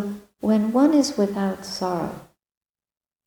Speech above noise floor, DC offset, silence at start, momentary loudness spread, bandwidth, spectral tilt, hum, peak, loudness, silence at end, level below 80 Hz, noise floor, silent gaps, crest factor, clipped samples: over 69 dB; under 0.1%; 0 s; 14 LU; 19.5 kHz; -5.5 dB/octave; none; -6 dBFS; -22 LUFS; 1 s; -60 dBFS; under -90 dBFS; none; 18 dB; under 0.1%